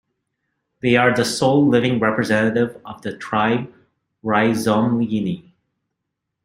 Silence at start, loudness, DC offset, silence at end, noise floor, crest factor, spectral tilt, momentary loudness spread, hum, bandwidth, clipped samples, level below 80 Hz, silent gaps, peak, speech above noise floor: 0.85 s; -18 LUFS; under 0.1%; 1.05 s; -79 dBFS; 20 dB; -5.5 dB/octave; 15 LU; none; 16 kHz; under 0.1%; -58 dBFS; none; 0 dBFS; 61 dB